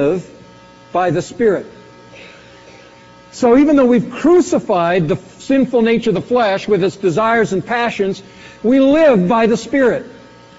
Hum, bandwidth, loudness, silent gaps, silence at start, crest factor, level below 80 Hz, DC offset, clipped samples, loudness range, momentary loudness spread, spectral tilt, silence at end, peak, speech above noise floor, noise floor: none; 8 kHz; -14 LUFS; none; 0 s; 12 dB; -48 dBFS; under 0.1%; under 0.1%; 4 LU; 10 LU; -5.5 dB/octave; 0.45 s; -2 dBFS; 28 dB; -42 dBFS